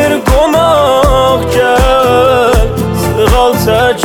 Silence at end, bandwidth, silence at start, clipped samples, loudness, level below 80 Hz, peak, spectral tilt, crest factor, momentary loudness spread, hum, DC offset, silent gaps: 0 s; 20 kHz; 0 s; under 0.1%; -9 LUFS; -18 dBFS; 0 dBFS; -5 dB/octave; 8 dB; 3 LU; none; under 0.1%; none